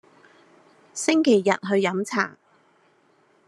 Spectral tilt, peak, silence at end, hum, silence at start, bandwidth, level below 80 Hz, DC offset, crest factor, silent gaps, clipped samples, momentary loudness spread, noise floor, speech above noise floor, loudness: -4.5 dB/octave; -4 dBFS; 1.2 s; none; 0.95 s; 12.5 kHz; -80 dBFS; under 0.1%; 20 dB; none; under 0.1%; 9 LU; -61 dBFS; 40 dB; -22 LUFS